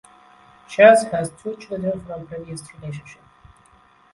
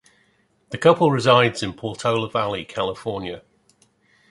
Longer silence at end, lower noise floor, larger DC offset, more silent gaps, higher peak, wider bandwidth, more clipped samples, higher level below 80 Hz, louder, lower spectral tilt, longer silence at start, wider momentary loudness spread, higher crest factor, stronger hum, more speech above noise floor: about the same, 1 s vs 0.9 s; second, -54 dBFS vs -63 dBFS; neither; neither; about the same, 0 dBFS vs -2 dBFS; about the same, 11.5 kHz vs 11.5 kHz; neither; about the same, -56 dBFS vs -56 dBFS; about the same, -18 LUFS vs -20 LUFS; about the same, -5 dB/octave vs -5.5 dB/octave; about the same, 0.7 s vs 0.7 s; first, 22 LU vs 15 LU; about the same, 22 dB vs 20 dB; neither; second, 35 dB vs 43 dB